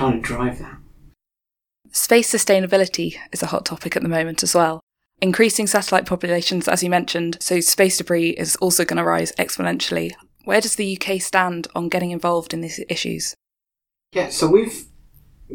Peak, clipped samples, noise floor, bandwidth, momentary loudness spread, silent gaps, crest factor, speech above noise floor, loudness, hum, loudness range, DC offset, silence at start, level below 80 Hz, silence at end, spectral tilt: 0 dBFS; under 0.1%; -87 dBFS; 19 kHz; 10 LU; 4.83-4.87 s; 20 dB; 67 dB; -19 LUFS; none; 4 LU; under 0.1%; 0 s; -48 dBFS; 0 s; -3.5 dB/octave